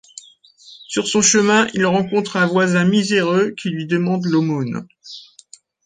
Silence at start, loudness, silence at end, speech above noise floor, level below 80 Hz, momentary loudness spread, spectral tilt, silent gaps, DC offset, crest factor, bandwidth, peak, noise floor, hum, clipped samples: 0.7 s; -17 LUFS; 0.65 s; 31 dB; -60 dBFS; 15 LU; -4 dB/octave; none; under 0.1%; 16 dB; 9.6 kHz; -2 dBFS; -47 dBFS; none; under 0.1%